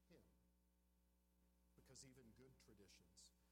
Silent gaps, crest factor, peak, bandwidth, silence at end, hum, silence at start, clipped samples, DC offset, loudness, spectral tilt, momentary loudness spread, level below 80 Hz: none; 20 dB; -52 dBFS; 15.5 kHz; 0 s; 60 Hz at -80 dBFS; 0 s; under 0.1%; under 0.1%; -68 LUFS; -3.5 dB/octave; 5 LU; -80 dBFS